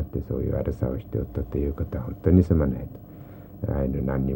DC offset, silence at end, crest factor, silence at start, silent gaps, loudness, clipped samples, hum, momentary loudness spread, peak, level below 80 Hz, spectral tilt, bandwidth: under 0.1%; 0 s; 20 dB; 0 s; none; -26 LUFS; under 0.1%; none; 20 LU; -6 dBFS; -34 dBFS; -11.5 dB/octave; 16 kHz